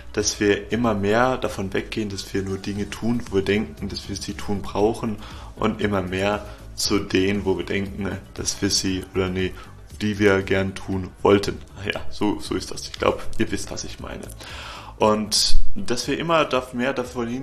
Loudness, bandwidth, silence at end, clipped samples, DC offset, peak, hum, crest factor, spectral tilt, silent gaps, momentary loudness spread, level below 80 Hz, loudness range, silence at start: -24 LUFS; 13.5 kHz; 0 s; under 0.1%; under 0.1%; -2 dBFS; none; 20 dB; -4 dB/octave; none; 12 LU; -32 dBFS; 3 LU; 0 s